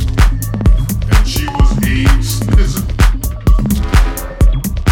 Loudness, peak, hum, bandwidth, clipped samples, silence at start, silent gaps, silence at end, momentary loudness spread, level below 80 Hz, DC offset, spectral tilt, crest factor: -14 LUFS; 0 dBFS; none; 17.5 kHz; under 0.1%; 0 s; none; 0 s; 3 LU; -12 dBFS; under 0.1%; -5.5 dB/octave; 10 dB